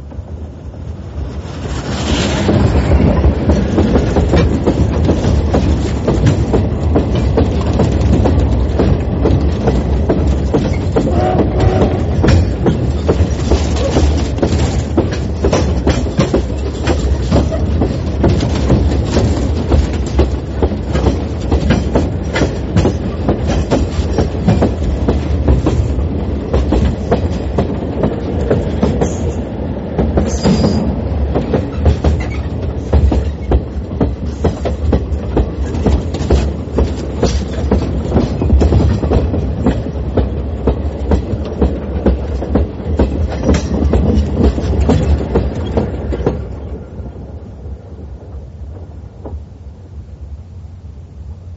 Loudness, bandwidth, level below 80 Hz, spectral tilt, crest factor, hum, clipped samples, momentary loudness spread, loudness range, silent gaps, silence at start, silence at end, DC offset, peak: -15 LUFS; 8 kHz; -18 dBFS; -7.5 dB/octave; 14 dB; none; under 0.1%; 15 LU; 4 LU; none; 0 s; 0 s; under 0.1%; 0 dBFS